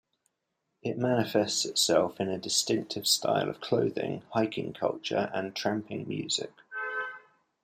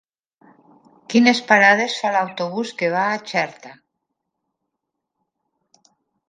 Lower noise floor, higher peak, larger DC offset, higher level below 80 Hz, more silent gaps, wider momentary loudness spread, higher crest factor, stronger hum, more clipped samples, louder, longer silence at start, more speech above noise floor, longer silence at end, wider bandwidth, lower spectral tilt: about the same, -81 dBFS vs -80 dBFS; second, -10 dBFS vs 0 dBFS; neither; about the same, -72 dBFS vs -74 dBFS; neither; about the same, 10 LU vs 12 LU; about the same, 20 dB vs 22 dB; neither; neither; second, -29 LUFS vs -18 LUFS; second, 0.85 s vs 1.1 s; second, 52 dB vs 61 dB; second, 0.45 s vs 2.55 s; first, 15.5 kHz vs 9.4 kHz; about the same, -3.5 dB/octave vs -4 dB/octave